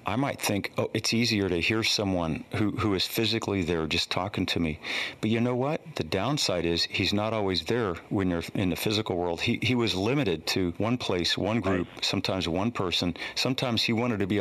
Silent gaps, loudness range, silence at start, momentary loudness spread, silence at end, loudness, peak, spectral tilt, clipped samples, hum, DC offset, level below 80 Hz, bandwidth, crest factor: none; 1 LU; 0 s; 4 LU; 0 s; -27 LUFS; -10 dBFS; -4.5 dB/octave; under 0.1%; none; under 0.1%; -52 dBFS; 13.5 kHz; 16 dB